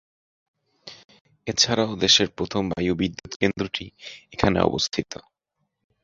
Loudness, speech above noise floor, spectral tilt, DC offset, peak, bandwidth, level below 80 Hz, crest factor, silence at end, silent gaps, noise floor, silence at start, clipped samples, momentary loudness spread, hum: -22 LUFS; 53 dB; -3.5 dB/octave; under 0.1%; -2 dBFS; 7.8 kHz; -48 dBFS; 22 dB; 0.85 s; 1.05-1.09 s, 1.21-1.25 s, 3.36-3.40 s; -77 dBFS; 0.85 s; under 0.1%; 22 LU; none